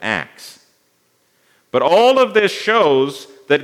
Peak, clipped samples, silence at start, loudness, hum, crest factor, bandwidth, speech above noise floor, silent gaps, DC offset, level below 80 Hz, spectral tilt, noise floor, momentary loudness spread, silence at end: 0 dBFS; under 0.1%; 0 s; -15 LUFS; none; 16 dB; 15.5 kHz; 46 dB; none; under 0.1%; -70 dBFS; -4 dB/octave; -61 dBFS; 11 LU; 0 s